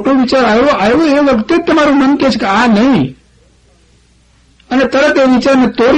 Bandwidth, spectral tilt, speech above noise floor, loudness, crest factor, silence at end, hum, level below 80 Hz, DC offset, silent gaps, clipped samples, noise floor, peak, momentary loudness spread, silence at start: 9 kHz; -5.5 dB/octave; 39 dB; -10 LUFS; 10 dB; 0 s; none; -40 dBFS; under 0.1%; none; under 0.1%; -48 dBFS; 0 dBFS; 3 LU; 0 s